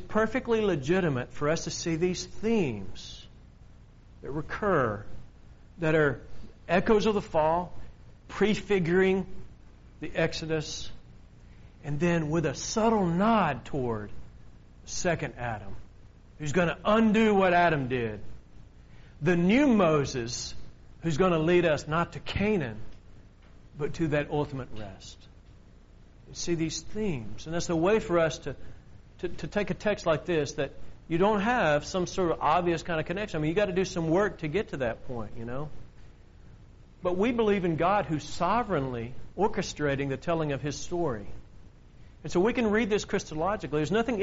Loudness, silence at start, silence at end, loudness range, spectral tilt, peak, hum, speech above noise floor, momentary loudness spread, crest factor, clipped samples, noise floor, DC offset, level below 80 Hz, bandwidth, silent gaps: -28 LUFS; 0 s; 0 s; 7 LU; -5 dB/octave; -8 dBFS; none; 25 dB; 15 LU; 20 dB; under 0.1%; -52 dBFS; under 0.1%; -48 dBFS; 7.6 kHz; none